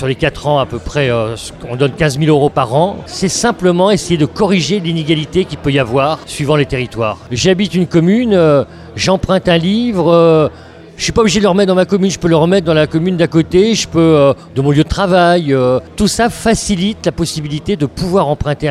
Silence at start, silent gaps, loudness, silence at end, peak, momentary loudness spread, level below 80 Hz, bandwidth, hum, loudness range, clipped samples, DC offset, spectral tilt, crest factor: 0 s; none; -13 LUFS; 0 s; 0 dBFS; 7 LU; -34 dBFS; 13.5 kHz; none; 3 LU; under 0.1%; under 0.1%; -5.5 dB/octave; 12 dB